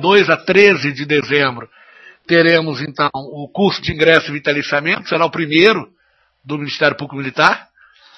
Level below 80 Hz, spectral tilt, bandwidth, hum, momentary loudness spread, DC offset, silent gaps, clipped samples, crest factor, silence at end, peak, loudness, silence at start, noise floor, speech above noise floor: -52 dBFS; -5.5 dB/octave; 8 kHz; none; 12 LU; under 0.1%; none; under 0.1%; 16 dB; 0.55 s; 0 dBFS; -14 LUFS; 0 s; -57 dBFS; 42 dB